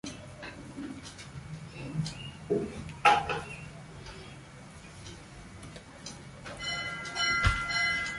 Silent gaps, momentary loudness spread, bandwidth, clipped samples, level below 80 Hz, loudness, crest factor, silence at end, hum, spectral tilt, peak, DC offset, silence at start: none; 21 LU; 11.5 kHz; under 0.1%; -48 dBFS; -31 LUFS; 26 dB; 0 s; none; -4 dB/octave; -8 dBFS; under 0.1%; 0.05 s